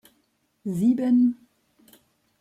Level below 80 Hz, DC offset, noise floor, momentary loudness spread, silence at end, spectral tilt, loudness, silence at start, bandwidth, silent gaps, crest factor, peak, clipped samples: -72 dBFS; under 0.1%; -70 dBFS; 17 LU; 1.05 s; -8.5 dB/octave; -22 LUFS; 0.65 s; 12 kHz; none; 14 dB; -12 dBFS; under 0.1%